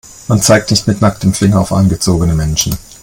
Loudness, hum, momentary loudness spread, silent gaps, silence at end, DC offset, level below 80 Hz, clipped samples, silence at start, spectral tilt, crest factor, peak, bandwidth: -12 LUFS; none; 5 LU; none; 0.1 s; under 0.1%; -30 dBFS; 0.1%; 0.3 s; -5 dB/octave; 12 dB; 0 dBFS; 17.5 kHz